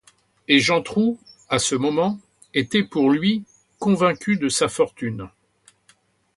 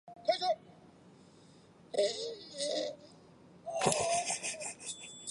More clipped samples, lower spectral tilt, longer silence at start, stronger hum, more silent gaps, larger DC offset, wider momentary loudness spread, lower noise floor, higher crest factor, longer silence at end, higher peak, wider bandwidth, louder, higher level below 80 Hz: neither; first, -4 dB/octave vs -2 dB/octave; first, 0.5 s vs 0.05 s; neither; neither; neither; about the same, 12 LU vs 11 LU; about the same, -60 dBFS vs -60 dBFS; about the same, 22 dB vs 26 dB; first, 1.1 s vs 0 s; first, 0 dBFS vs -12 dBFS; about the same, 11.5 kHz vs 11.5 kHz; first, -21 LUFS vs -35 LUFS; first, -58 dBFS vs -72 dBFS